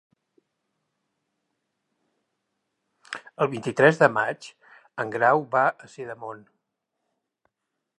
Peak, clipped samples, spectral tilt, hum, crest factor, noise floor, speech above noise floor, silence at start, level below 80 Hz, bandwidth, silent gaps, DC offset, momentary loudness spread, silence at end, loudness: -2 dBFS; under 0.1%; -6 dB/octave; none; 26 dB; -82 dBFS; 59 dB; 3.1 s; -78 dBFS; 11.5 kHz; none; under 0.1%; 20 LU; 1.6 s; -22 LUFS